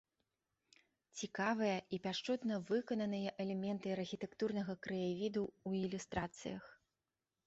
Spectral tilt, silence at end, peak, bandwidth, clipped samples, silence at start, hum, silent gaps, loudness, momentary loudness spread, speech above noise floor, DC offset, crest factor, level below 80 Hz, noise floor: -5 dB/octave; 0.7 s; -24 dBFS; 8 kHz; under 0.1%; 1.15 s; none; none; -41 LUFS; 8 LU; over 50 dB; under 0.1%; 18 dB; -70 dBFS; under -90 dBFS